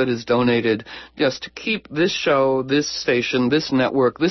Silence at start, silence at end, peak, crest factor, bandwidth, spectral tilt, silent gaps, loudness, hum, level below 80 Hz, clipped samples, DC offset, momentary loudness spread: 0 s; 0 s; -6 dBFS; 14 dB; 6.2 kHz; -5 dB/octave; none; -20 LUFS; none; -56 dBFS; under 0.1%; under 0.1%; 6 LU